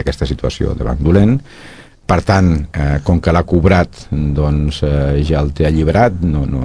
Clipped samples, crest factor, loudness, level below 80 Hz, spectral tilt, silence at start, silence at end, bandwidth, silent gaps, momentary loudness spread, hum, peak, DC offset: under 0.1%; 14 dB; -14 LUFS; -22 dBFS; -8 dB/octave; 0 s; 0 s; 10.5 kHz; none; 7 LU; none; 0 dBFS; 0.8%